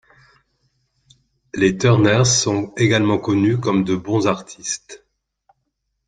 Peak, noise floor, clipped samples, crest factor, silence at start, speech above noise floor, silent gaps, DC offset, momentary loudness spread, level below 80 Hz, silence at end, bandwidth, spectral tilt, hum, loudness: -2 dBFS; -74 dBFS; under 0.1%; 18 dB; 1.55 s; 56 dB; none; under 0.1%; 12 LU; -52 dBFS; 1.1 s; 9.6 kHz; -5 dB/octave; none; -18 LUFS